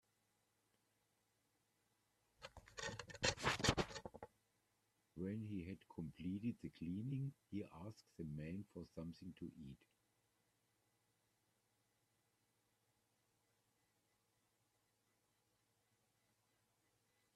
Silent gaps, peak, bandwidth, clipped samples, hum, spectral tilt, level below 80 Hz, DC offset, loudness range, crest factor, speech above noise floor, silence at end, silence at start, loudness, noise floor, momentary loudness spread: none; -20 dBFS; 13.5 kHz; under 0.1%; none; -4 dB/octave; -70 dBFS; under 0.1%; 14 LU; 30 dB; 35 dB; 7.6 s; 2.4 s; -47 LUFS; -84 dBFS; 20 LU